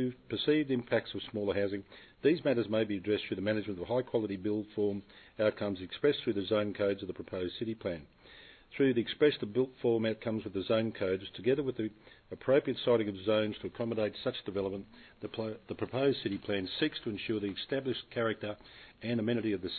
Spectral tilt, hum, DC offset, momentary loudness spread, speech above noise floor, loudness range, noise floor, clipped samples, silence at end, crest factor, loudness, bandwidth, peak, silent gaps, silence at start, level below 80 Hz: -9.5 dB/octave; none; under 0.1%; 10 LU; 23 dB; 3 LU; -56 dBFS; under 0.1%; 0 s; 18 dB; -33 LUFS; 4.6 kHz; -16 dBFS; none; 0 s; -64 dBFS